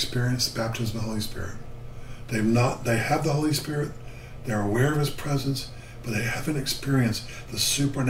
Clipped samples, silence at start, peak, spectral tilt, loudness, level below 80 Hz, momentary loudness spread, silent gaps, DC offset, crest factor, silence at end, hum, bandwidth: under 0.1%; 0 s; -8 dBFS; -4.5 dB/octave; -26 LUFS; -42 dBFS; 15 LU; none; under 0.1%; 18 dB; 0 s; none; 16 kHz